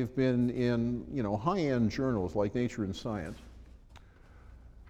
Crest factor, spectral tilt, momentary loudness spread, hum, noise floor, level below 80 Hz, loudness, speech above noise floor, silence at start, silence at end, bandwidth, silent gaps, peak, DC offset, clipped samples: 16 dB; -7.5 dB/octave; 9 LU; none; -55 dBFS; -52 dBFS; -32 LUFS; 24 dB; 0 s; 0 s; 8.6 kHz; none; -16 dBFS; under 0.1%; under 0.1%